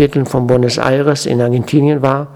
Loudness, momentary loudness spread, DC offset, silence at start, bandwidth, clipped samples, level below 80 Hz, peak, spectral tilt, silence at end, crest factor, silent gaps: -13 LUFS; 2 LU; under 0.1%; 0 s; 14 kHz; 0.1%; -42 dBFS; 0 dBFS; -6.5 dB/octave; 0 s; 12 dB; none